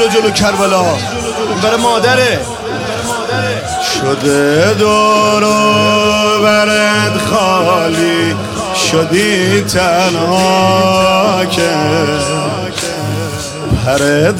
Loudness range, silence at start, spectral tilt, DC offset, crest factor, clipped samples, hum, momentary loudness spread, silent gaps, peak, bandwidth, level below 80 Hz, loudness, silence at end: 4 LU; 0 s; -4 dB/octave; under 0.1%; 10 dB; under 0.1%; none; 8 LU; none; 0 dBFS; 16.5 kHz; -36 dBFS; -11 LUFS; 0 s